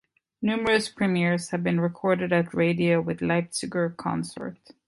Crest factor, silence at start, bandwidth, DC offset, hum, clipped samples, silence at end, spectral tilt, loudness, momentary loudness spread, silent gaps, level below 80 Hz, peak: 16 dB; 0.4 s; 11.5 kHz; under 0.1%; none; under 0.1%; 0.35 s; -6 dB/octave; -25 LUFS; 7 LU; none; -60 dBFS; -8 dBFS